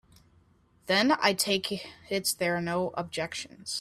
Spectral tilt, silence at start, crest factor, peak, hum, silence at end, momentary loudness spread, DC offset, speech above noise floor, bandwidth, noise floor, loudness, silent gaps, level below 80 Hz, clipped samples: -3 dB/octave; 0.85 s; 22 dB; -8 dBFS; none; 0 s; 11 LU; under 0.1%; 34 dB; 16 kHz; -63 dBFS; -28 LUFS; none; -66 dBFS; under 0.1%